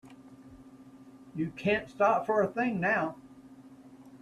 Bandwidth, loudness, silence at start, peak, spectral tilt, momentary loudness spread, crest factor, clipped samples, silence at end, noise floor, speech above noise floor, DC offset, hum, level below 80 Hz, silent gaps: 12.5 kHz; -29 LUFS; 0.05 s; -12 dBFS; -7 dB/octave; 10 LU; 20 dB; under 0.1%; 0.05 s; -53 dBFS; 24 dB; under 0.1%; none; -66 dBFS; none